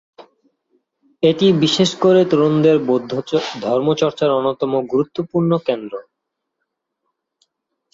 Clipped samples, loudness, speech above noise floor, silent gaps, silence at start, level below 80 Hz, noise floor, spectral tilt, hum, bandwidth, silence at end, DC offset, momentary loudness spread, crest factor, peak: under 0.1%; -17 LUFS; 62 dB; none; 1.2 s; -60 dBFS; -78 dBFS; -6 dB/octave; none; 7.8 kHz; 1.95 s; under 0.1%; 8 LU; 16 dB; -2 dBFS